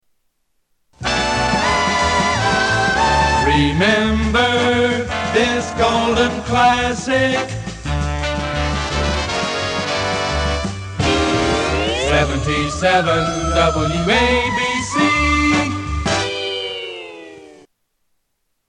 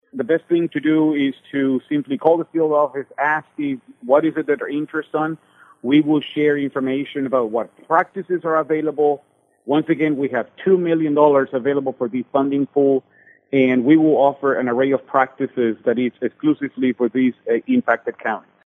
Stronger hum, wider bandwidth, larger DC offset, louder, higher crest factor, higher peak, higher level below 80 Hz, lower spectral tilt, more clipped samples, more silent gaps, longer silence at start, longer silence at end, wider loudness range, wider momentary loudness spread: neither; first, 11 kHz vs 3.8 kHz; neither; about the same, -17 LUFS vs -19 LUFS; about the same, 16 dB vs 18 dB; about the same, -2 dBFS vs 0 dBFS; first, -30 dBFS vs -72 dBFS; second, -4.5 dB/octave vs -8.5 dB/octave; neither; neither; first, 1 s vs 0.15 s; first, 1.15 s vs 0.25 s; about the same, 5 LU vs 3 LU; about the same, 7 LU vs 8 LU